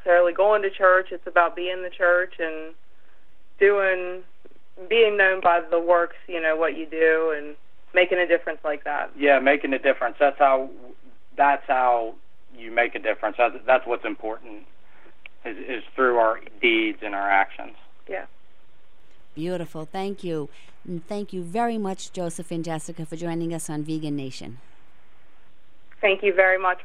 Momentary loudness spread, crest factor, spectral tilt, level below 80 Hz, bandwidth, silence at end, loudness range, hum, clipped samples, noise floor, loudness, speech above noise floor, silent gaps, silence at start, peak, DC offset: 16 LU; 20 dB; -5 dB/octave; -64 dBFS; 13 kHz; 0 s; 10 LU; none; under 0.1%; -61 dBFS; -23 LUFS; 38 dB; none; 0.05 s; -4 dBFS; 2%